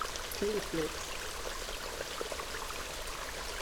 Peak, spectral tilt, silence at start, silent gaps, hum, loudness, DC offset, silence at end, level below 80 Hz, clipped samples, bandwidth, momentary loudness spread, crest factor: -20 dBFS; -2.5 dB/octave; 0 s; none; none; -38 LUFS; under 0.1%; 0 s; -48 dBFS; under 0.1%; over 20 kHz; 5 LU; 18 dB